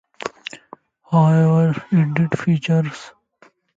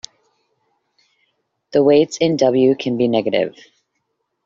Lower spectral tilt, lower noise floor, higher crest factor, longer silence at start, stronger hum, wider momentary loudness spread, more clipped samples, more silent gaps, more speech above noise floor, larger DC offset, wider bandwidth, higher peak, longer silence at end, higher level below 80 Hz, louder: first, -8 dB/octave vs -5 dB/octave; second, -55 dBFS vs -72 dBFS; about the same, 16 dB vs 16 dB; second, 0.25 s vs 1.75 s; neither; first, 19 LU vs 7 LU; neither; neither; second, 38 dB vs 57 dB; neither; about the same, 7.8 kHz vs 7.6 kHz; about the same, -2 dBFS vs -2 dBFS; second, 0.7 s vs 0.95 s; about the same, -60 dBFS vs -62 dBFS; about the same, -18 LUFS vs -16 LUFS